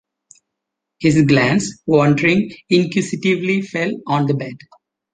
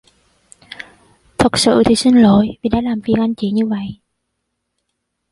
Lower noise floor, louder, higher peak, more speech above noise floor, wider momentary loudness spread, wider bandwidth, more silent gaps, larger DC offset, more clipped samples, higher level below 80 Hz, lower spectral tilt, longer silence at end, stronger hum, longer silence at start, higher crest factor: first, -80 dBFS vs -73 dBFS; second, -17 LUFS vs -14 LUFS; about the same, -2 dBFS vs -2 dBFS; first, 64 dB vs 60 dB; second, 8 LU vs 22 LU; second, 9.6 kHz vs 11.5 kHz; neither; neither; neither; second, -52 dBFS vs -42 dBFS; about the same, -6 dB/octave vs -5 dB/octave; second, 0.6 s vs 1.4 s; neither; first, 1 s vs 0.7 s; about the same, 16 dB vs 16 dB